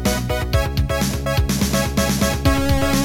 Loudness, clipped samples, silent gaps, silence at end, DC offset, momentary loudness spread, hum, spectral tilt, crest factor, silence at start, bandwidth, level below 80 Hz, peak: -19 LUFS; under 0.1%; none; 0 s; under 0.1%; 3 LU; none; -5 dB/octave; 14 dB; 0 s; 17 kHz; -24 dBFS; -4 dBFS